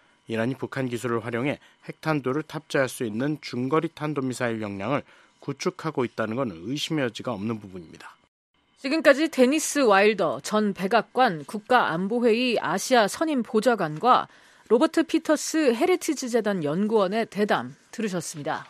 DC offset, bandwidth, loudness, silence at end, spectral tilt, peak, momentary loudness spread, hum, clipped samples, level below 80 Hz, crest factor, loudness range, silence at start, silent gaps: under 0.1%; 14.5 kHz; -24 LUFS; 0.05 s; -4.5 dB/octave; -4 dBFS; 10 LU; none; under 0.1%; -70 dBFS; 20 dB; 7 LU; 0.3 s; 8.28-8.54 s